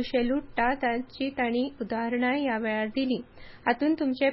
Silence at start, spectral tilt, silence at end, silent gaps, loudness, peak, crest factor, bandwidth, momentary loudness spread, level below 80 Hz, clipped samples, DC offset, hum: 0 s; -9 dB/octave; 0 s; none; -28 LUFS; -12 dBFS; 16 dB; 5.8 kHz; 5 LU; -54 dBFS; under 0.1%; under 0.1%; none